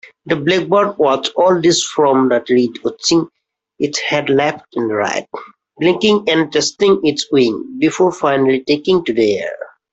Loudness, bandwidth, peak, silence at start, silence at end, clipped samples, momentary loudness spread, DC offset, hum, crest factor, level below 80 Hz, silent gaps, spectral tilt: -15 LUFS; 8.2 kHz; -2 dBFS; 0.25 s; 0.25 s; under 0.1%; 8 LU; under 0.1%; none; 12 dB; -56 dBFS; none; -4 dB/octave